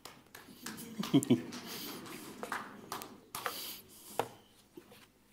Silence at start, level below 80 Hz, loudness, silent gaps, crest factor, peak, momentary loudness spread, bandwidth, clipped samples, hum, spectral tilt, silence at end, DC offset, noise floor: 0.05 s; -76 dBFS; -38 LUFS; none; 24 dB; -16 dBFS; 23 LU; 16 kHz; under 0.1%; none; -4.5 dB/octave; 0.25 s; under 0.1%; -61 dBFS